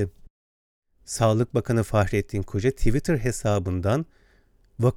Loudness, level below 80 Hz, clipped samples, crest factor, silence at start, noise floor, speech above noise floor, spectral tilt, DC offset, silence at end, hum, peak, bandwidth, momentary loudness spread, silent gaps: -25 LUFS; -36 dBFS; under 0.1%; 18 dB; 0 s; -59 dBFS; 36 dB; -6.5 dB/octave; under 0.1%; 0 s; none; -6 dBFS; 16 kHz; 6 LU; 0.30-0.82 s